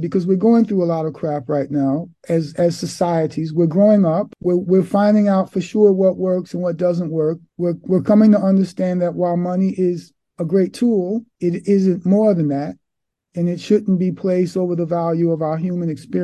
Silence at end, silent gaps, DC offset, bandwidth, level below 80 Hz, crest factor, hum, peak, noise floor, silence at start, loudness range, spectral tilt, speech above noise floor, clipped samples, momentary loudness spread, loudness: 0 s; none; under 0.1%; 11.5 kHz; -60 dBFS; 14 dB; none; -2 dBFS; -79 dBFS; 0 s; 4 LU; -8.5 dB/octave; 62 dB; under 0.1%; 9 LU; -18 LUFS